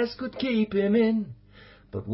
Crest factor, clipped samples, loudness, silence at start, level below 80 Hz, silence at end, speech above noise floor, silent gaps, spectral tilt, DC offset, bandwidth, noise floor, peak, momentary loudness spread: 14 dB; under 0.1%; -25 LUFS; 0 s; -56 dBFS; 0 s; 27 dB; none; -10.5 dB/octave; under 0.1%; 5.8 kHz; -52 dBFS; -12 dBFS; 16 LU